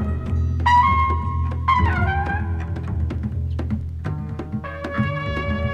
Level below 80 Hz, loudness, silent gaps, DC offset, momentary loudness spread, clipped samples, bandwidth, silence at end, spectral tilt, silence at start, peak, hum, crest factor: -28 dBFS; -22 LUFS; none; under 0.1%; 12 LU; under 0.1%; 7 kHz; 0 s; -7.5 dB/octave; 0 s; -6 dBFS; none; 16 dB